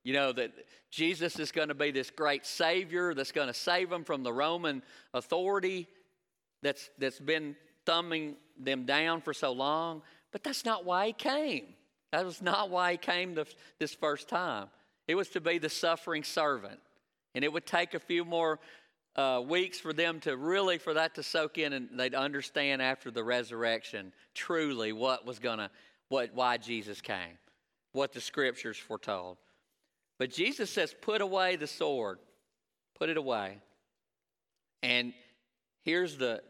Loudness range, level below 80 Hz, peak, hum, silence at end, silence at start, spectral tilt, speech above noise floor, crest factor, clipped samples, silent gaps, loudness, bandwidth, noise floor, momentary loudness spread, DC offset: 4 LU; -86 dBFS; -12 dBFS; none; 0.1 s; 0.05 s; -3.5 dB/octave; over 57 dB; 22 dB; under 0.1%; none; -33 LUFS; 16 kHz; under -90 dBFS; 10 LU; under 0.1%